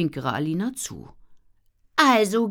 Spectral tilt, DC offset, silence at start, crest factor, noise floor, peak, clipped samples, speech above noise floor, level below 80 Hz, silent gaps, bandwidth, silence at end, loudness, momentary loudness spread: -4.5 dB/octave; under 0.1%; 0 s; 20 dB; -60 dBFS; -4 dBFS; under 0.1%; 38 dB; -58 dBFS; none; 19.5 kHz; 0 s; -22 LUFS; 16 LU